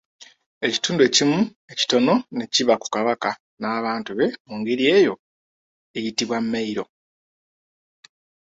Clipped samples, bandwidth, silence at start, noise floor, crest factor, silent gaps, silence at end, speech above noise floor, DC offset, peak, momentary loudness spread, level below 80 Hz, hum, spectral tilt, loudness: under 0.1%; 8 kHz; 0.2 s; under -90 dBFS; 20 dB; 0.46-0.61 s, 1.56-1.68 s, 3.40-3.57 s, 4.40-4.45 s, 5.19-5.94 s; 1.65 s; over 69 dB; under 0.1%; -2 dBFS; 13 LU; -66 dBFS; none; -3.5 dB/octave; -21 LUFS